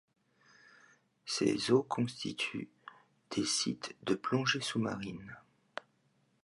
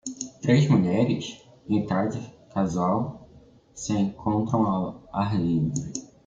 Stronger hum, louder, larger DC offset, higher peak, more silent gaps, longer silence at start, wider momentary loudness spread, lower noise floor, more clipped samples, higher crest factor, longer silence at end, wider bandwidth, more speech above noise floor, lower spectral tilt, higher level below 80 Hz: neither; second, -34 LUFS vs -25 LUFS; neither; second, -14 dBFS vs -8 dBFS; neither; first, 1.25 s vs 0.05 s; first, 20 LU vs 14 LU; first, -74 dBFS vs -53 dBFS; neither; about the same, 22 dB vs 18 dB; first, 1.05 s vs 0.2 s; first, 11.5 kHz vs 9.2 kHz; first, 40 dB vs 29 dB; second, -4 dB/octave vs -6.5 dB/octave; second, -72 dBFS vs -56 dBFS